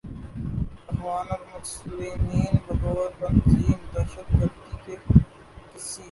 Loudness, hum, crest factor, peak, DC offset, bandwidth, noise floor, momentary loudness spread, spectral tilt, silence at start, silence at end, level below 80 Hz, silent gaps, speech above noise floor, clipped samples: -26 LUFS; none; 22 dB; -2 dBFS; under 0.1%; 11.5 kHz; -46 dBFS; 17 LU; -7.5 dB/octave; 0.05 s; 0 s; -32 dBFS; none; 23 dB; under 0.1%